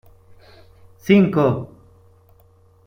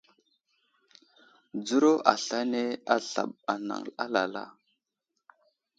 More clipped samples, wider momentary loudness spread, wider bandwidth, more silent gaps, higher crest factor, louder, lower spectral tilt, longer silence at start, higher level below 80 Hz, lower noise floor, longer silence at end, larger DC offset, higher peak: neither; first, 20 LU vs 14 LU; first, 16 kHz vs 9.2 kHz; neither; second, 20 dB vs 28 dB; first, -17 LUFS vs -28 LUFS; first, -8 dB/octave vs -3.5 dB/octave; second, 1.05 s vs 1.55 s; first, -54 dBFS vs -80 dBFS; second, -53 dBFS vs -84 dBFS; about the same, 1.2 s vs 1.3 s; neither; about the same, -2 dBFS vs -2 dBFS